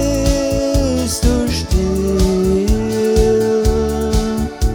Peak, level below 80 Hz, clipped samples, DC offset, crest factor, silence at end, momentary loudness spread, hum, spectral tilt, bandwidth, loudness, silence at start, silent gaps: -2 dBFS; -20 dBFS; under 0.1%; under 0.1%; 14 dB; 0 s; 4 LU; none; -6 dB/octave; 19.5 kHz; -16 LUFS; 0 s; none